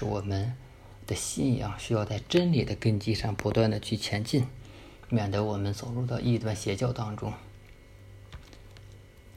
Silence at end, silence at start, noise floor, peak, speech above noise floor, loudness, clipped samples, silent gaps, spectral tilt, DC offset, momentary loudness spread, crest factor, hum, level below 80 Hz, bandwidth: 0.05 s; 0 s; -51 dBFS; -10 dBFS; 22 dB; -30 LUFS; under 0.1%; none; -6 dB/octave; under 0.1%; 22 LU; 20 dB; none; -50 dBFS; 15 kHz